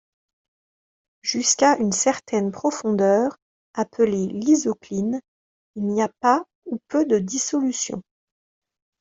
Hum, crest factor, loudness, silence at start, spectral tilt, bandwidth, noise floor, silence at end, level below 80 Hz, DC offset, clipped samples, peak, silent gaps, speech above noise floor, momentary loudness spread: none; 20 dB; -22 LUFS; 1.25 s; -4 dB/octave; 8.2 kHz; under -90 dBFS; 1 s; -64 dBFS; under 0.1%; under 0.1%; -4 dBFS; 3.42-3.74 s, 5.28-5.74 s, 6.55-6.62 s; over 69 dB; 11 LU